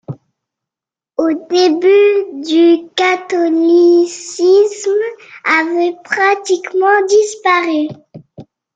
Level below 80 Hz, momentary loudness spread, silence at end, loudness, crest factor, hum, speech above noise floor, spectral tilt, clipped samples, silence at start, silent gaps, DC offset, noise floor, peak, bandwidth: -66 dBFS; 9 LU; 0.3 s; -13 LUFS; 12 dB; none; 75 dB; -4 dB/octave; under 0.1%; 0.1 s; none; under 0.1%; -87 dBFS; 0 dBFS; 9 kHz